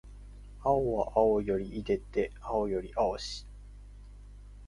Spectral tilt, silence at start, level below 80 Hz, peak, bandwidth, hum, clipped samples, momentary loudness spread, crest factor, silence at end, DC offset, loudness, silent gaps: -6 dB/octave; 0.05 s; -48 dBFS; -12 dBFS; 11 kHz; 50 Hz at -45 dBFS; under 0.1%; 24 LU; 20 dB; 0 s; under 0.1%; -31 LUFS; none